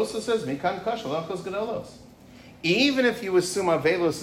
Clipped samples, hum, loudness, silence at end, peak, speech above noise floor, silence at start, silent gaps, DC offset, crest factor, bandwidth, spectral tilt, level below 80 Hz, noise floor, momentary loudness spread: under 0.1%; none; -25 LUFS; 0 s; -10 dBFS; 23 dB; 0 s; none; under 0.1%; 16 dB; 16 kHz; -4.5 dB/octave; -60 dBFS; -48 dBFS; 10 LU